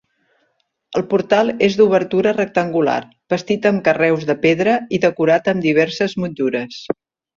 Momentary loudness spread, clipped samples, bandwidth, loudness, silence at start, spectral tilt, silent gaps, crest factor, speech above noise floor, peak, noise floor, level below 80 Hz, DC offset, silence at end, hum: 10 LU; under 0.1%; 7.4 kHz; -17 LUFS; 0.9 s; -6 dB/octave; none; 16 dB; 50 dB; -2 dBFS; -67 dBFS; -58 dBFS; under 0.1%; 0.45 s; none